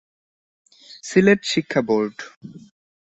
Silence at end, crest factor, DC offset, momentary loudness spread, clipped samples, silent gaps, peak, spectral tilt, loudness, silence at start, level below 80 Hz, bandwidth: 0.5 s; 20 dB; under 0.1%; 21 LU; under 0.1%; 2.36-2.41 s; -2 dBFS; -5 dB/octave; -19 LUFS; 1.05 s; -62 dBFS; 8.4 kHz